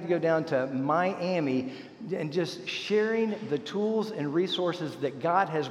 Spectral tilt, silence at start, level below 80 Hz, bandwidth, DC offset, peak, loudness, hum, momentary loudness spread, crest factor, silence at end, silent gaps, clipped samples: -6 dB/octave; 0 s; -78 dBFS; 12 kHz; under 0.1%; -10 dBFS; -29 LUFS; none; 7 LU; 18 dB; 0 s; none; under 0.1%